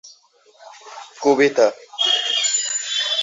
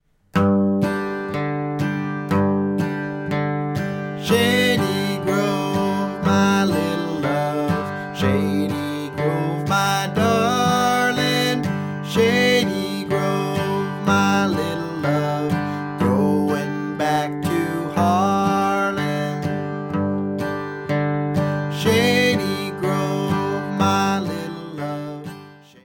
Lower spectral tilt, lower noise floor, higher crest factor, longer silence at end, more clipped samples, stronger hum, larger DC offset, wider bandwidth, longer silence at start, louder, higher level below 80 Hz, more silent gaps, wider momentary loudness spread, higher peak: second, -0.5 dB/octave vs -5.5 dB/octave; first, -53 dBFS vs -42 dBFS; about the same, 18 dB vs 16 dB; second, 0 s vs 0.25 s; neither; neither; neither; second, 8 kHz vs 17.5 kHz; second, 0.05 s vs 0.35 s; first, -18 LUFS vs -21 LUFS; second, -72 dBFS vs -54 dBFS; neither; first, 19 LU vs 8 LU; about the same, -4 dBFS vs -6 dBFS